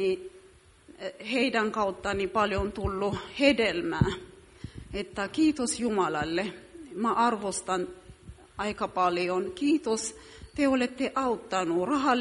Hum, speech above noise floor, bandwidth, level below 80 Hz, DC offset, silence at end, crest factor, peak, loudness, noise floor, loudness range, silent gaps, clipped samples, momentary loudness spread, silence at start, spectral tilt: none; 28 dB; 11.5 kHz; -50 dBFS; under 0.1%; 0 s; 22 dB; -8 dBFS; -28 LUFS; -56 dBFS; 2 LU; none; under 0.1%; 15 LU; 0 s; -4.5 dB/octave